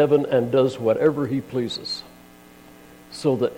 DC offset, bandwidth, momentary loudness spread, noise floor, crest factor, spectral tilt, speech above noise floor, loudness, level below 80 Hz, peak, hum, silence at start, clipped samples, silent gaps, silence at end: under 0.1%; 16.5 kHz; 11 LU; -47 dBFS; 16 dB; -6.5 dB/octave; 26 dB; -22 LUFS; -60 dBFS; -6 dBFS; 60 Hz at -50 dBFS; 0 s; under 0.1%; none; 0 s